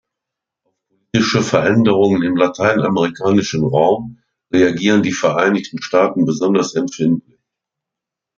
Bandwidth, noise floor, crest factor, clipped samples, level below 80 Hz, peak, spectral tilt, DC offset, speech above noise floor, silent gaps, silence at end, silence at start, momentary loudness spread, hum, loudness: 7.6 kHz; -84 dBFS; 14 dB; under 0.1%; -54 dBFS; -2 dBFS; -5.5 dB/octave; under 0.1%; 69 dB; none; 1.15 s; 1.15 s; 6 LU; none; -16 LUFS